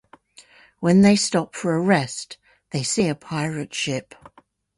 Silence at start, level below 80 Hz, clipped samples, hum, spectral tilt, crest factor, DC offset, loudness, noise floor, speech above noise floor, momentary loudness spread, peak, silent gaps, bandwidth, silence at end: 0.8 s; -58 dBFS; under 0.1%; none; -5 dB/octave; 20 dB; under 0.1%; -21 LUFS; -56 dBFS; 36 dB; 15 LU; -4 dBFS; none; 11.5 kHz; 0.75 s